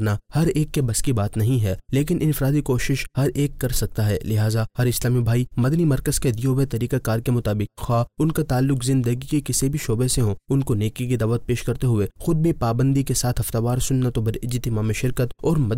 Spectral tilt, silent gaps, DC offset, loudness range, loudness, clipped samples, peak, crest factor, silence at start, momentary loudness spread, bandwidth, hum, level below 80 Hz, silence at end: -6 dB/octave; none; 0.1%; 1 LU; -22 LUFS; under 0.1%; -12 dBFS; 10 dB; 0 s; 4 LU; 16 kHz; none; -36 dBFS; 0 s